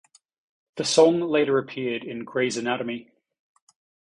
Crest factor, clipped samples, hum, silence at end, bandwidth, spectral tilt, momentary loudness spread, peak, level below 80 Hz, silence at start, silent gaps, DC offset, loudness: 20 dB; under 0.1%; none; 1.05 s; 11 kHz; -4 dB/octave; 14 LU; -4 dBFS; -70 dBFS; 0.75 s; none; under 0.1%; -23 LUFS